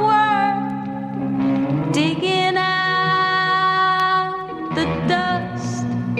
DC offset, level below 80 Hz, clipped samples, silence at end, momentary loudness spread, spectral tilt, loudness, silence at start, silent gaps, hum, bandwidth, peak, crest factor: under 0.1%; -50 dBFS; under 0.1%; 0 s; 9 LU; -5.5 dB/octave; -19 LUFS; 0 s; none; none; 12 kHz; -6 dBFS; 14 dB